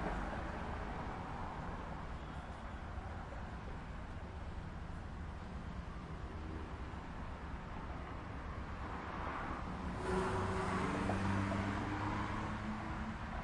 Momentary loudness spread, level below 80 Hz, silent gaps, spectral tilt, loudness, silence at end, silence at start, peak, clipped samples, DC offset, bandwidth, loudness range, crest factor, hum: 10 LU; -48 dBFS; none; -6.5 dB/octave; -43 LUFS; 0 s; 0 s; -22 dBFS; under 0.1%; under 0.1%; 11 kHz; 9 LU; 20 dB; none